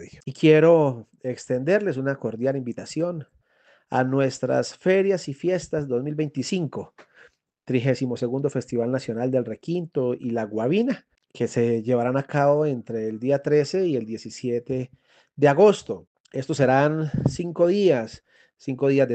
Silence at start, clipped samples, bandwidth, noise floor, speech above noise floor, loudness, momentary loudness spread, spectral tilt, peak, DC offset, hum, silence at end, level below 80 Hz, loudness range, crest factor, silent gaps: 0 s; under 0.1%; 9 kHz; -61 dBFS; 38 dB; -23 LUFS; 13 LU; -7 dB/octave; -4 dBFS; under 0.1%; none; 0 s; -60 dBFS; 5 LU; 20 dB; 16.07-16.24 s